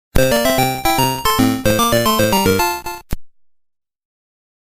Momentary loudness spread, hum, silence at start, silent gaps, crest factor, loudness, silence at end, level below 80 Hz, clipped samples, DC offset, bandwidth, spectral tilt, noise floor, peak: 14 LU; none; 0.15 s; none; 16 dB; -15 LUFS; 1.35 s; -32 dBFS; under 0.1%; under 0.1%; 16 kHz; -4 dB/octave; -49 dBFS; 0 dBFS